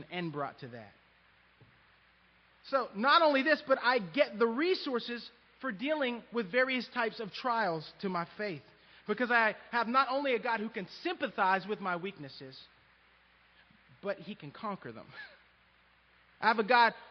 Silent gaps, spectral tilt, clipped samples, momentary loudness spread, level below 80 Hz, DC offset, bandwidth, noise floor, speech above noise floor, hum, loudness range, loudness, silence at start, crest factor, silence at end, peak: none; -2 dB/octave; under 0.1%; 21 LU; -78 dBFS; under 0.1%; 6.2 kHz; -66 dBFS; 34 dB; none; 15 LU; -32 LUFS; 0 s; 22 dB; 0 s; -12 dBFS